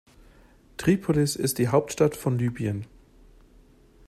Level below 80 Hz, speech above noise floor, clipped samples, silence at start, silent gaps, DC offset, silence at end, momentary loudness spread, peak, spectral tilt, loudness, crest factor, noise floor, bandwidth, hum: -52 dBFS; 31 dB; under 0.1%; 0.8 s; none; under 0.1%; 1.25 s; 11 LU; -8 dBFS; -6 dB/octave; -25 LUFS; 18 dB; -55 dBFS; 15.5 kHz; none